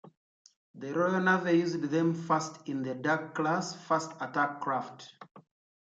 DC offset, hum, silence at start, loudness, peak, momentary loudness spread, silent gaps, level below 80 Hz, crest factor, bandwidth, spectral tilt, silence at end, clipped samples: under 0.1%; none; 0.05 s; -30 LUFS; -14 dBFS; 10 LU; 0.17-0.45 s, 0.56-0.74 s, 5.31-5.35 s; -80 dBFS; 18 dB; 8 kHz; -5.5 dB/octave; 0.45 s; under 0.1%